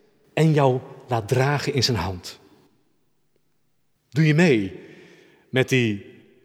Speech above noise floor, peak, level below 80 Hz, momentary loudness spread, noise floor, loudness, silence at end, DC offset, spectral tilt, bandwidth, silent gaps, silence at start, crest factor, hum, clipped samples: 52 dB; -4 dBFS; -56 dBFS; 15 LU; -72 dBFS; -22 LUFS; 0.35 s; under 0.1%; -6 dB/octave; 14.5 kHz; none; 0.35 s; 20 dB; none; under 0.1%